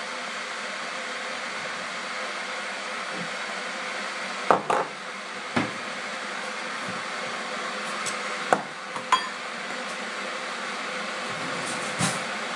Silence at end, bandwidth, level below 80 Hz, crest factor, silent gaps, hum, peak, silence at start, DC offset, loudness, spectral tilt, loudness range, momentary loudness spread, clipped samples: 0 s; 11.5 kHz; -78 dBFS; 30 dB; none; none; 0 dBFS; 0 s; under 0.1%; -29 LUFS; -2.5 dB/octave; 2 LU; 6 LU; under 0.1%